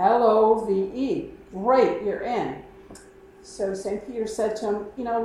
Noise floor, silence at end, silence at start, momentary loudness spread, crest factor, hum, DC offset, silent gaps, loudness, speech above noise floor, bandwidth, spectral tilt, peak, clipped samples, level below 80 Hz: -48 dBFS; 0 s; 0 s; 12 LU; 18 dB; none; under 0.1%; none; -24 LUFS; 23 dB; 12 kHz; -6 dB/octave; -6 dBFS; under 0.1%; -56 dBFS